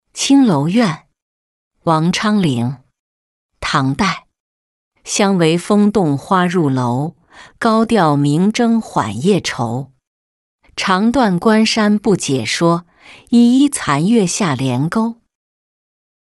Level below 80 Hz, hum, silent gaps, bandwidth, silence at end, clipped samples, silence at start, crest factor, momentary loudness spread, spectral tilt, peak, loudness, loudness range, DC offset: -48 dBFS; none; 1.22-1.71 s, 2.99-3.49 s, 4.40-4.91 s, 10.07-10.58 s; 12 kHz; 1.1 s; under 0.1%; 0.15 s; 14 dB; 9 LU; -5.5 dB/octave; -2 dBFS; -15 LUFS; 4 LU; under 0.1%